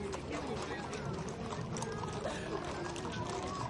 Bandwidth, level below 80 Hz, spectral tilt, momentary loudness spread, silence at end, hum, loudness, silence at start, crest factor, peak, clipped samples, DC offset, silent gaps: 11.5 kHz; -56 dBFS; -5 dB/octave; 2 LU; 0 s; none; -40 LUFS; 0 s; 16 dB; -24 dBFS; under 0.1%; under 0.1%; none